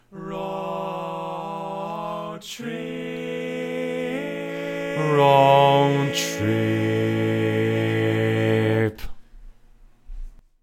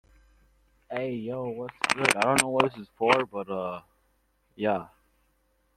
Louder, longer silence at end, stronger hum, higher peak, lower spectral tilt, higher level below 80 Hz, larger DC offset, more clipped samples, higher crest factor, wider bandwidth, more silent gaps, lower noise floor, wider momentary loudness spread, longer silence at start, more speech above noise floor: first, -23 LUFS vs -27 LUFS; second, 0.3 s vs 0.9 s; neither; second, -4 dBFS vs 0 dBFS; first, -6 dB/octave vs -3 dB/octave; first, -46 dBFS vs -64 dBFS; neither; neither; second, 18 dB vs 28 dB; about the same, 16.5 kHz vs 16 kHz; neither; second, -50 dBFS vs -70 dBFS; first, 15 LU vs 12 LU; second, 0.1 s vs 0.9 s; second, 31 dB vs 42 dB